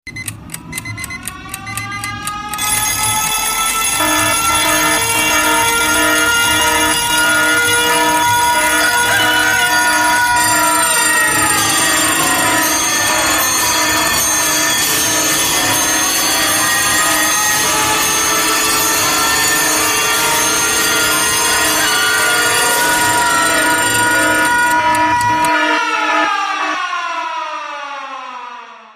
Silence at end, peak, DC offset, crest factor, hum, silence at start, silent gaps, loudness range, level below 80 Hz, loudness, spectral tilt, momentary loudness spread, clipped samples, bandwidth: 0.1 s; -2 dBFS; under 0.1%; 12 dB; none; 0.05 s; none; 4 LU; -42 dBFS; -12 LUFS; -0.5 dB/octave; 11 LU; under 0.1%; 15.5 kHz